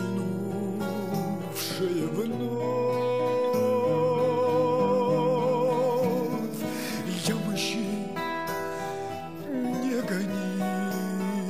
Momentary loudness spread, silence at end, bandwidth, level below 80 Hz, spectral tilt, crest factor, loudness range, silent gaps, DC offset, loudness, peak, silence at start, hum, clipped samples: 7 LU; 0 s; 15.5 kHz; -70 dBFS; -5.5 dB/octave; 14 dB; 6 LU; none; 0.3%; -28 LUFS; -14 dBFS; 0 s; none; under 0.1%